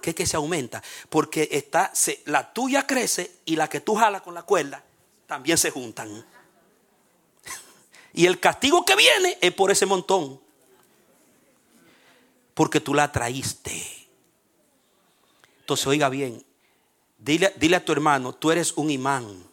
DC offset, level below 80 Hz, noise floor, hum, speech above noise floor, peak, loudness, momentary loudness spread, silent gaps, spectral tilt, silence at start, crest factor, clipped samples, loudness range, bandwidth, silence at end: under 0.1%; -58 dBFS; -66 dBFS; none; 43 dB; -2 dBFS; -22 LUFS; 17 LU; none; -3 dB/octave; 0.05 s; 22 dB; under 0.1%; 9 LU; 18 kHz; 0.1 s